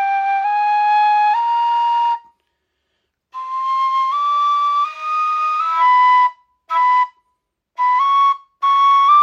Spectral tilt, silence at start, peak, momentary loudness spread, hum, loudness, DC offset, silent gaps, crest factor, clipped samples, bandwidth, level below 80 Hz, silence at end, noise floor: 2.5 dB/octave; 0 s; -4 dBFS; 9 LU; none; -16 LUFS; under 0.1%; none; 12 dB; under 0.1%; 7.6 kHz; -80 dBFS; 0 s; -72 dBFS